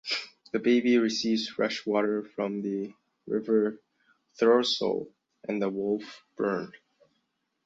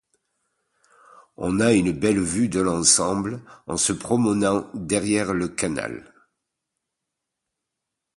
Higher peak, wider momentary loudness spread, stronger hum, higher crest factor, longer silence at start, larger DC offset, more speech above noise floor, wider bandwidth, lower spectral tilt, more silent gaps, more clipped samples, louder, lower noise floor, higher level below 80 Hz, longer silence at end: second, -10 dBFS vs -2 dBFS; about the same, 12 LU vs 13 LU; neither; about the same, 20 dB vs 22 dB; second, 0.05 s vs 1.4 s; neither; second, 50 dB vs 61 dB; second, 7.8 kHz vs 11.5 kHz; about the same, -4.5 dB/octave vs -4 dB/octave; neither; neither; second, -28 LUFS vs -22 LUFS; second, -77 dBFS vs -83 dBFS; second, -74 dBFS vs -50 dBFS; second, 0.9 s vs 2.15 s